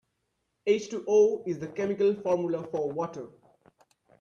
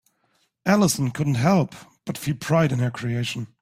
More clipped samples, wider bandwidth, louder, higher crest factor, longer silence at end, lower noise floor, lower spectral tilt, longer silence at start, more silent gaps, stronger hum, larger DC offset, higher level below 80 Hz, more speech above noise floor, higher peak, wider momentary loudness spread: neither; second, 7.2 kHz vs 16 kHz; second, -28 LUFS vs -23 LUFS; about the same, 16 dB vs 20 dB; first, 0.9 s vs 0.15 s; first, -79 dBFS vs -68 dBFS; about the same, -6 dB/octave vs -5.5 dB/octave; about the same, 0.65 s vs 0.65 s; neither; neither; neither; second, -72 dBFS vs -56 dBFS; first, 51 dB vs 46 dB; second, -12 dBFS vs -4 dBFS; about the same, 12 LU vs 11 LU